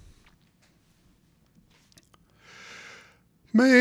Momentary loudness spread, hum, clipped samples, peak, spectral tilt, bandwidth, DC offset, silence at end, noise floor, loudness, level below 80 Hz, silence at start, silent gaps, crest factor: 30 LU; none; under 0.1%; -6 dBFS; -5 dB/octave; 12 kHz; under 0.1%; 0 s; -63 dBFS; -22 LUFS; -66 dBFS; 3.55 s; none; 22 dB